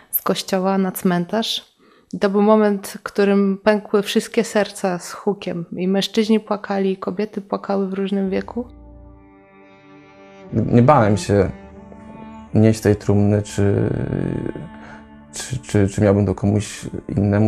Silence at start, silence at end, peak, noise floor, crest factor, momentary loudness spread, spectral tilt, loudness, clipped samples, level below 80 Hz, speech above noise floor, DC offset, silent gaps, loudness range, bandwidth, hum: 0.1 s; 0 s; -2 dBFS; -47 dBFS; 18 dB; 15 LU; -6.5 dB/octave; -19 LUFS; under 0.1%; -46 dBFS; 29 dB; under 0.1%; none; 5 LU; 14.5 kHz; none